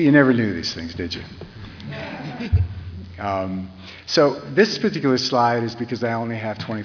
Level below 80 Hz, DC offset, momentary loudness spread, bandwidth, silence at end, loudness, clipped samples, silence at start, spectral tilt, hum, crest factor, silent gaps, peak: -40 dBFS; under 0.1%; 18 LU; 5.4 kHz; 0 s; -21 LUFS; under 0.1%; 0 s; -6 dB/octave; none; 20 dB; none; -2 dBFS